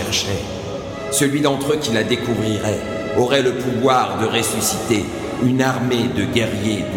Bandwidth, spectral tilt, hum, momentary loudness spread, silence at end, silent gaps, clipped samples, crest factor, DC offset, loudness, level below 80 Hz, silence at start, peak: 16.5 kHz; -4.5 dB/octave; none; 7 LU; 0 s; none; under 0.1%; 18 dB; under 0.1%; -19 LUFS; -44 dBFS; 0 s; -2 dBFS